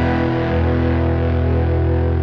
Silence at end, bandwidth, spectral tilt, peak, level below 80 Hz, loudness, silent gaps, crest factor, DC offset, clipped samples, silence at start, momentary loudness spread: 0 s; 5.4 kHz; -10 dB/octave; -6 dBFS; -24 dBFS; -18 LUFS; none; 10 dB; under 0.1%; under 0.1%; 0 s; 1 LU